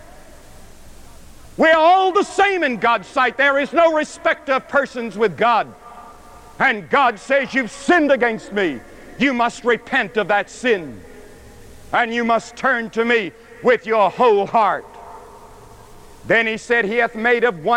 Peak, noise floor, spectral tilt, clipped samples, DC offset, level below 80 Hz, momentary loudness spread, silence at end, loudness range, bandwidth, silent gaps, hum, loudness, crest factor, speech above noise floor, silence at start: -4 dBFS; -42 dBFS; -4 dB/octave; under 0.1%; under 0.1%; -50 dBFS; 7 LU; 0 s; 4 LU; 14.5 kHz; none; none; -17 LUFS; 14 dB; 24 dB; 0.35 s